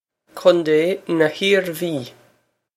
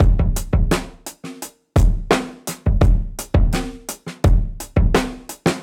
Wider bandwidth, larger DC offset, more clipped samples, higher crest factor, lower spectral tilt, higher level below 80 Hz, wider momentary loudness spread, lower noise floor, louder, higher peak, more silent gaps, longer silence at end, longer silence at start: about the same, 16 kHz vs 16.5 kHz; neither; neither; about the same, 18 dB vs 16 dB; about the same, -5 dB/octave vs -6 dB/octave; second, -72 dBFS vs -20 dBFS; second, 10 LU vs 15 LU; first, -62 dBFS vs -36 dBFS; about the same, -19 LUFS vs -20 LUFS; about the same, 0 dBFS vs -2 dBFS; neither; first, 0.65 s vs 0 s; first, 0.35 s vs 0 s